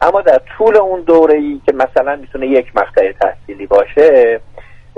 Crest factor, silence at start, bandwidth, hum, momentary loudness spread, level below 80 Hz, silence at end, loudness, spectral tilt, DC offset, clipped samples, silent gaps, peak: 12 dB; 0 s; 6.6 kHz; none; 9 LU; -40 dBFS; 0.2 s; -12 LUFS; -6.5 dB/octave; under 0.1%; under 0.1%; none; 0 dBFS